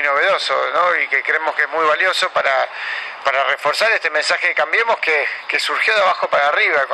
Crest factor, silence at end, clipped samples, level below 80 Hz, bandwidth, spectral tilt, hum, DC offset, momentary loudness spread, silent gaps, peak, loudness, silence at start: 16 dB; 0 s; under 0.1%; -70 dBFS; 12.5 kHz; -0.5 dB/octave; none; under 0.1%; 5 LU; none; -2 dBFS; -16 LUFS; 0 s